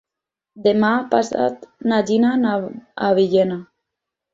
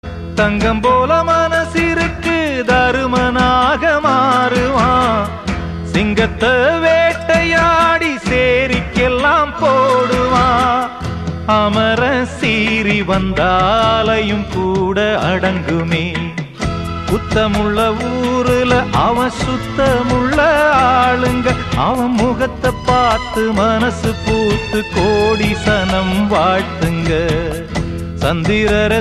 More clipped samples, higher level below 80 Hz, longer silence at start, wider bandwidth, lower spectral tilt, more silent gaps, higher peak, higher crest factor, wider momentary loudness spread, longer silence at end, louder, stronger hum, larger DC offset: neither; second, -62 dBFS vs -30 dBFS; first, 0.55 s vs 0.05 s; second, 7.8 kHz vs 14 kHz; about the same, -6 dB/octave vs -5.5 dB/octave; neither; about the same, -2 dBFS vs 0 dBFS; about the same, 18 dB vs 14 dB; about the same, 9 LU vs 7 LU; first, 0.7 s vs 0 s; second, -19 LUFS vs -14 LUFS; neither; second, under 0.1% vs 0.2%